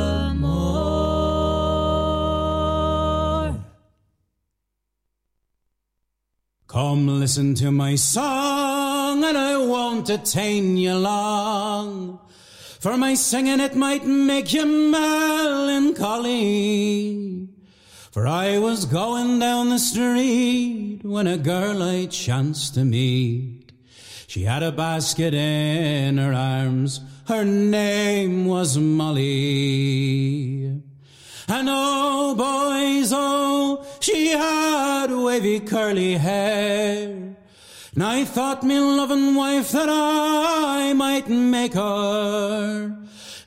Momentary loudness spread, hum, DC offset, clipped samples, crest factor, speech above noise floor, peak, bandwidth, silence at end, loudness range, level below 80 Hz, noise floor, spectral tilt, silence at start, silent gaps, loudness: 8 LU; none; under 0.1%; under 0.1%; 12 dB; 57 dB; -8 dBFS; 16 kHz; 0.05 s; 4 LU; -40 dBFS; -78 dBFS; -5 dB/octave; 0 s; none; -21 LUFS